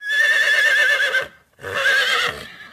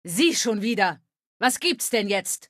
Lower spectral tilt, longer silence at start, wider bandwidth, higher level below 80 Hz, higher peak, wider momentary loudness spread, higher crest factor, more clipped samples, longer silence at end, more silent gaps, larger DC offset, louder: second, 0 dB/octave vs -2.5 dB/octave; about the same, 0 s vs 0.05 s; about the same, 15.5 kHz vs 15 kHz; first, -58 dBFS vs -74 dBFS; about the same, -6 dBFS vs -6 dBFS; first, 18 LU vs 5 LU; second, 12 dB vs 18 dB; neither; about the same, 0.05 s vs 0.05 s; second, none vs 1.26-1.40 s; neither; first, -16 LUFS vs -23 LUFS